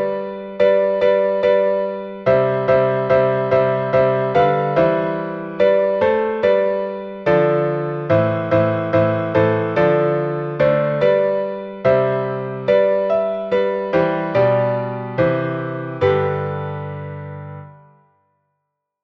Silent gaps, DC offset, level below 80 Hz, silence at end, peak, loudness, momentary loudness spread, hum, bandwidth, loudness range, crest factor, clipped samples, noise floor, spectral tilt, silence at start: none; under 0.1%; -52 dBFS; 1.35 s; -2 dBFS; -18 LUFS; 9 LU; none; 6 kHz; 4 LU; 16 dB; under 0.1%; -76 dBFS; -9 dB/octave; 0 s